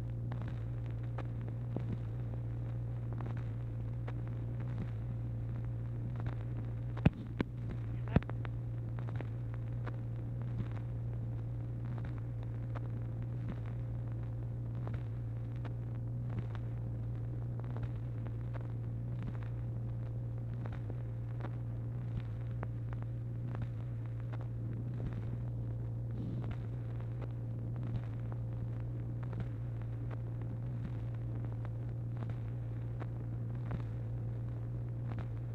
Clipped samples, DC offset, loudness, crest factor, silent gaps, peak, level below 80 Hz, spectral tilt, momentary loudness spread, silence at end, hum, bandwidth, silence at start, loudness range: under 0.1%; under 0.1%; -40 LUFS; 26 dB; none; -14 dBFS; -50 dBFS; -10 dB/octave; 1 LU; 0 s; none; 4.1 kHz; 0 s; 3 LU